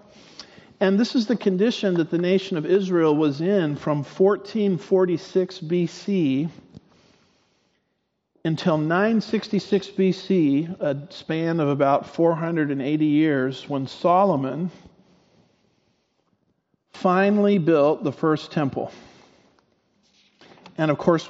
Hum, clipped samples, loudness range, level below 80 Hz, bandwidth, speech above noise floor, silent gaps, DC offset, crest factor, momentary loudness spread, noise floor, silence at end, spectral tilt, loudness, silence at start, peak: none; under 0.1%; 5 LU; -68 dBFS; 7.8 kHz; 53 dB; none; under 0.1%; 20 dB; 9 LU; -74 dBFS; 0 s; -6 dB/octave; -22 LUFS; 0.4 s; -4 dBFS